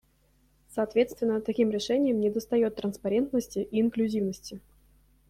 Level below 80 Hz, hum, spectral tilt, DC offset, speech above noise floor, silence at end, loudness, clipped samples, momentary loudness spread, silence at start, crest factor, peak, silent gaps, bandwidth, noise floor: -60 dBFS; none; -6 dB/octave; under 0.1%; 38 dB; 0.7 s; -28 LUFS; under 0.1%; 8 LU; 0.7 s; 16 dB; -12 dBFS; none; 15.5 kHz; -66 dBFS